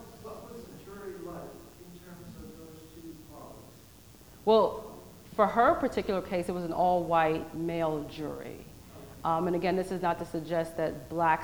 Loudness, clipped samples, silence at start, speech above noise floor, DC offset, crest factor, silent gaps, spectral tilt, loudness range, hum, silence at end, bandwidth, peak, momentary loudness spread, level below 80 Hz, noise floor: -29 LUFS; under 0.1%; 0 s; 25 dB; under 0.1%; 20 dB; none; -6.5 dB/octave; 17 LU; none; 0 s; over 20 kHz; -10 dBFS; 23 LU; -58 dBFS; -53 dBFS